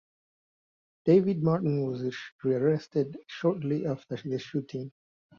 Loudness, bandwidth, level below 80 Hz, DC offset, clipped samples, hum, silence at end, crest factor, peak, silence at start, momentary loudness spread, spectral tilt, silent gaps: -29 LUFS; 7 kHz; -70 dBFS; under 0.1%; under 0.1%; none; 0.5 s; 18 dB; -10 dBFS; 1.05 s; 12 LU; -8.5 dB/octave; 2.32-2.39 s